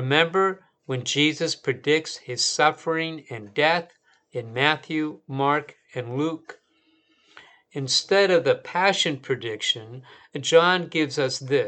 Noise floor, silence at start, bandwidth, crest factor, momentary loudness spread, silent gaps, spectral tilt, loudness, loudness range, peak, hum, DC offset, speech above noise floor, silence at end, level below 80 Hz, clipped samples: -65 dBFS; 0 s; 9.2 kHz; 22 dB; 16 LU; none; -3.5 dB/octave; -23 LUFS; 5 LU; -2 dBFS; none; under 0.1%; 41 dB; 0 s; -78 dBFS; under 0.1%